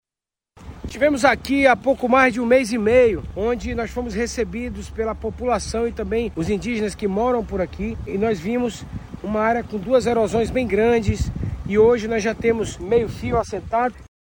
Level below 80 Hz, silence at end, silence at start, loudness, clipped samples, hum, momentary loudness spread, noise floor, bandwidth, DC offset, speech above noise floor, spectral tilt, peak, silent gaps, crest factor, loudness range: -36 dBFS; 0.3 s; 0.6 s; -21 LUFS; under 0.1%; none; 10 LU; -89 dBFS; 16.5 kHz; under 0.1%; 69 dB; -6 dB/octave; -4 dBFS; none; 18 dB; 6 LU